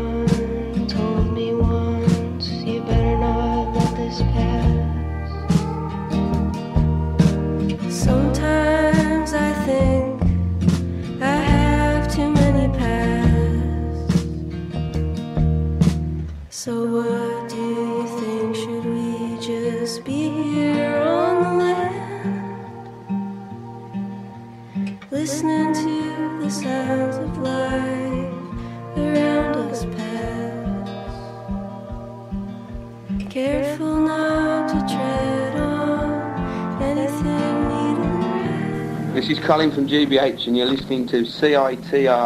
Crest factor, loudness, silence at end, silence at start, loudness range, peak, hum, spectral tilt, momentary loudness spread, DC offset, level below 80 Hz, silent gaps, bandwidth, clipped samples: 18 dB; -21 LUFS; 0 s; 0 s; 6 LU; -4 dBFS; none; -6.5 dB/octave; 12 LU; under 0.1%; -30 dBFS; none; 14 kHz; under 0.1%